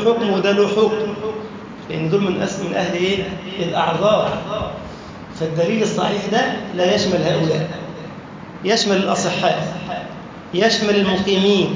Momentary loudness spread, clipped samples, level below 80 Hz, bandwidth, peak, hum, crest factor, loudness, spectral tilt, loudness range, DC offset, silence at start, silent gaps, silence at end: 16 LU; under 0.1%; -48 dBFS; 7.6 kHz; -2 dBFS; none; 16 dB; -19 LUFS; -5 dB/octave; 2 LU; under 0.1%; 0 s; none; 0 s